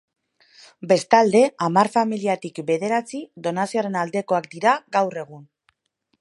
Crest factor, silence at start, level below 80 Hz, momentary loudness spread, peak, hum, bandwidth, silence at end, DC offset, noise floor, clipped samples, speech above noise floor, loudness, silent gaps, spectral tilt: 20 dB; 0.8 s; -76 dBFS; 12 LU; 0 dBFS; none; 11.5 kHz; 0.8 s; under 0.1%; -72 dBFS; under 0.1%; 51 dB; -21 LUFS; none; -5 dB/octave